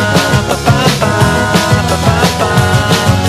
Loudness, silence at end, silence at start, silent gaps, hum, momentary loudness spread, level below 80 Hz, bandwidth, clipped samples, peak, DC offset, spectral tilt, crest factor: -10 LUFS; 0 s; 0 s; none; none; 1 LU; -26 dBFS; 14.5 kHz; 0.3%; 0 dBFS; under 0.1%; -5 dB/octave; 10 dB